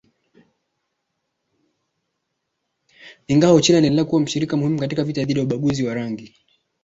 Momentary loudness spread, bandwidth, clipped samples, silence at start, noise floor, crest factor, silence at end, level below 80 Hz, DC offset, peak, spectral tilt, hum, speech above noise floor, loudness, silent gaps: 10 LU; 8 kHz; under 0.1%; 3.05 s; -76 dBFS; 20 dB; 0.55 s; -56 dBFS; under 0.1%; -2 dBFS; -5.5 dB/octave; none; 58 dB; -19 LUFS; none